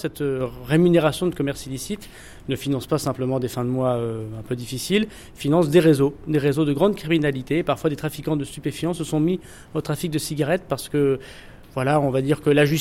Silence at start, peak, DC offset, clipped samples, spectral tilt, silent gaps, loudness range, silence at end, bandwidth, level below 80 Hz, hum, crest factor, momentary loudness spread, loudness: 0 s; -6 dBFS; under 0.1%; under 0.1%; -6 dB/octave; none; 5 LU; 0 s; 16.5 kHz; -48 dBFS; none; 16 dB; 12 LU; -22 LUFS